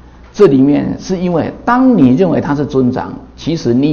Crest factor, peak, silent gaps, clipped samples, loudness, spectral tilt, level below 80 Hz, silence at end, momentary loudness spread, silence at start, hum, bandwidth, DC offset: 12 dB; 0 dBFS; none; 0.7%; -12 LUFS; -7.5 dB/octave; -38 dBFS; 0 s; 12 LU; 0.35 s; none; 7 kHz; under 0.1%